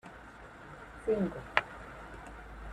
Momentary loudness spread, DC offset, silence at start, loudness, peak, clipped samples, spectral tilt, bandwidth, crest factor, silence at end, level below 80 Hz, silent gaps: 18 LU; under 0.1%; 0.05 s; -35 LUFS; -4 dBFS; under 0.1%; -6 dB/octave; 13 kHz; 34 dB; 0 s; -54 dBFS; none